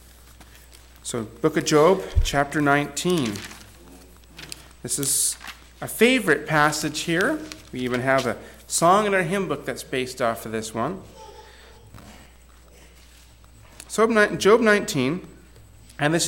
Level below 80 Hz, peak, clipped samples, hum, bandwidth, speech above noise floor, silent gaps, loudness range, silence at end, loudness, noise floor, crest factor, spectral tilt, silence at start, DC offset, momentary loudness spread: -40 dBFS; -6 dBFS; under 0.1%; none; 17.5 kHz; 28 dB; none; 9 LU; 0 s; -22 LUFS; -49 dBFS; 18 dB; -4 dB/octave; 0.4 s; under 0.1%; 18 LU